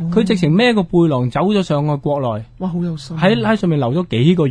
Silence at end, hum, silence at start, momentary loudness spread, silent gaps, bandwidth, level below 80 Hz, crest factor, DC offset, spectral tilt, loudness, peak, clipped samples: 0 s; none; 0 s; 9 LU; none; 10 kHz; -44 dBFS; 14 dB; under 0.1%; -7.5 dB/octave; -16 LUFS; 0 dBFS; under 0.1%